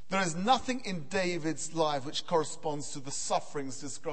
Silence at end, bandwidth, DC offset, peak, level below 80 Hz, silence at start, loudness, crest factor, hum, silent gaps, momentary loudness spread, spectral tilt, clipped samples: 0 s; 8.8 kHz; 1%; -12 dBFS; -64 dBFS; 0.1 s; -32 LUFS; 20 dB; none; none; 10 LU; -3.5 dB/octave; under 0.1%